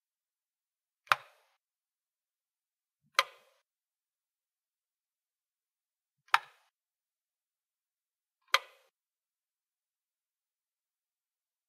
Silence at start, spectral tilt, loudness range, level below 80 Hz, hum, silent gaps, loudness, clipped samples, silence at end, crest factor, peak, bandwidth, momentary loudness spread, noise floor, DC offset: 1.1 s; 1.5 dB/octave; 3 LU; under -90 dBFS; none; 7.43-7.47 s, 7.65-7.69 s; -32 LUFS; under 0.1%; 3.1 s; 36 dB; -6 dBFS; 15.5 kHz; 1 LU; under -90 dBFS; under 0.1%